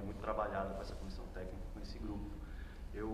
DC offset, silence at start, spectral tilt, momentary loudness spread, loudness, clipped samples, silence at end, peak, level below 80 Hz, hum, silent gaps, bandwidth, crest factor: under 0.1%; 0 s; -7 dB/octave; 11 LU; -45 LUFS; under 0.1%; 0 s; -24 dBFS; -48 dBFS; none; none; 15 kHz; 20 dB